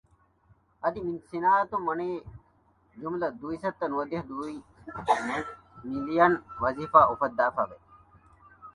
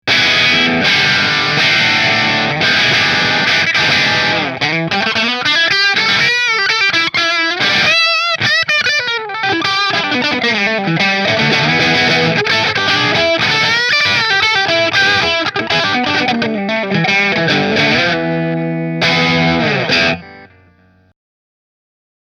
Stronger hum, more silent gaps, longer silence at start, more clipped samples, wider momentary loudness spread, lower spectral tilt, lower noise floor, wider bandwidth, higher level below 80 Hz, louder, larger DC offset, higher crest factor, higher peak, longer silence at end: neither; neither; first, 0.85 s vs 0.05 s; neither; first, 15 LU vs 5 LU; first, -6.5 dB/octave vs -3.5 dB/octave; first, -65 dBFS vs -50 dBFS; second, 11.5 kHz vs 15 kHz; second, -60 dBFS vs -50 dBFS; second, -28 LUFS vs -11 LUFS; neither; first, 24 dB vs 14 dB; second, -4 dBFS vs 0 dBFS; second, 0.05 s vs 1.9 s